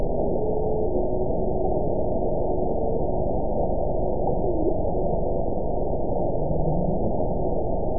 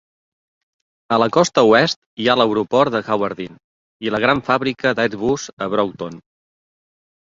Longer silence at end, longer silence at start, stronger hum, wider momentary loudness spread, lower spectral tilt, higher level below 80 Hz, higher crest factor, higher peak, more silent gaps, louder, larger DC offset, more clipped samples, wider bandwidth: second, 0 s vs 1.15 s; second, 0 s vs 1.1 s; neither; second, 2 LU vs 11 LU; first, -18.5 dB/octave vs -4.5 dB/octave; first, -32 dBFS vs -56 dBFS; second, 12 dB vs 18 dB; second, -10 dBFS vs 0 dBFS; second, none vs 1.96-2.17 s, 3.64-4.00 s, 5.53-5.57 s; second, -26 LUFS vs -18 LUFS; first, 5% vs under 0.1%; neither; second, 1 kHz vs 7.8 kHz